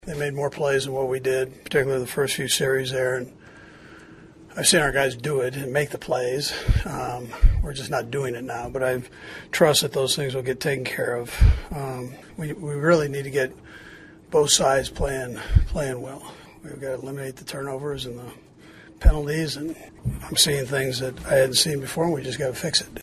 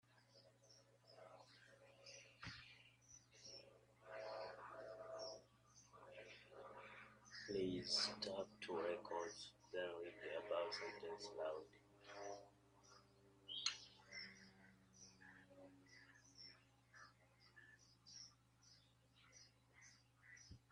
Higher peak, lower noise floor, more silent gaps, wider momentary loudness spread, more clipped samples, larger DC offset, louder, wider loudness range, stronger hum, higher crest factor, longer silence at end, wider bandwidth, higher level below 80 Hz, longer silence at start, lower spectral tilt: first, -2 dBFS vs -26 dBFS; second, -47 dBFS vs -74 dBFS; neither; second, 15 LU vs 23 LU; neither; neither; first, -24 LUFS vs -50 LUFS; second, 6 LU vs 18 LU; neither; second, 22 dB vs 28 dB; second, 0 s vs 0.15 s; first, 13 kHz vs 11 kHz; first, -30 dBFS vs -82 dBFS; about the same, 0.05 s vs 0.1 s; about the same, -3.5 dB/octave vs -3 dB/octave